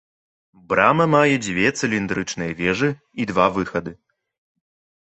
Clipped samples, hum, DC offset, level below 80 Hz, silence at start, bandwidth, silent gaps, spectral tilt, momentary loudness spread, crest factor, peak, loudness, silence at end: under 0.1%; none; under 0.1%; -52 dBFS; 0.7 s; 8.4 kHz; none; -5 dB/octave; 11 LU; 20 dB; 0 dBFS; -20 LUFS; 1.1 s